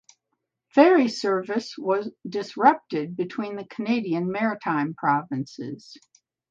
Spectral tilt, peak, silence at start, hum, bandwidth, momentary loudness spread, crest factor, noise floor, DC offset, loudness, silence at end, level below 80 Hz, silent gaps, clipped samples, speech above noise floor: -6 dB/octave; -4 dBFS; 0.75 s; none; 7.8 kHz; 14 LU; 20 dB; -79 dBFS; under 0.1%; -24 LUFS; 0.55 s; -74 dBFS; none; under 0.1%; 56 dB